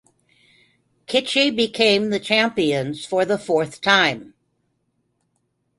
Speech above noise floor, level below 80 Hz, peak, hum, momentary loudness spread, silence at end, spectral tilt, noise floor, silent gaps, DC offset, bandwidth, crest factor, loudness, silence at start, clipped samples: 51 dB; -62 dBFS; -2 dBFS; 60 Hz at -55 dBFS; 6 LU; 1.5 s; -4 dB/octave; -71 dBFS; none; under 0.1%; 11.5 kHz; 20 dB; -19 LUFS; 1.1 s; under 0.1%